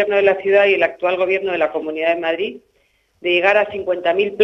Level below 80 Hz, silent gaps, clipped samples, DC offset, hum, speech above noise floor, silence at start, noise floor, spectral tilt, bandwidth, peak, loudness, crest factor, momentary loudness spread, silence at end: -60 dBFS; none; under 0.1%; under 0.1%; none; 44 dB; 0 s; -61 dBFS; -5.5 dB/octave; 6.4 kHz; 0 dBFS; -17 LUFS; 16 dB; 7 LU; 0 s